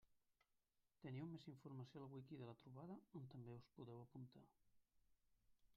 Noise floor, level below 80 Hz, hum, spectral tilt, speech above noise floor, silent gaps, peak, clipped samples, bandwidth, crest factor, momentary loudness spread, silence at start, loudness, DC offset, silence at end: -88 dBFS; -88 dBFS; none; -7.5 dB/octave; 30 dB; none; -42 dBFS; under 0.1%; 6.8 kHz; 18 dB; 6 LU; 0.05 s; -59 LUFS; under 0.1%; 0 s